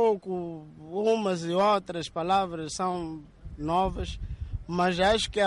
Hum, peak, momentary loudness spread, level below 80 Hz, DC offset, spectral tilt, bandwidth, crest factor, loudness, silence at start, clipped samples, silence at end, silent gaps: none; -14 dBFS; 14 LU; -44 dBFS; under 0.1%; -5 dB/octave; 11.5 kHz; 14 dB; -28 LUFS; 0 s; under 0.1%; 0 s; none